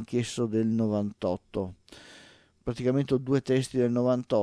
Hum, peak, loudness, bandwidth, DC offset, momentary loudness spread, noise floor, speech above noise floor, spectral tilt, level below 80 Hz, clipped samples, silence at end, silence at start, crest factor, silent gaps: none; -12 dBFS; -28 LUFS; 11 kHz; under 0.1%; 12 LU; -56 dBFS; 28 dB; -7 dB/octave; -58 dBFS; under 0.1%; 0 s; 0 s; 16 dB; none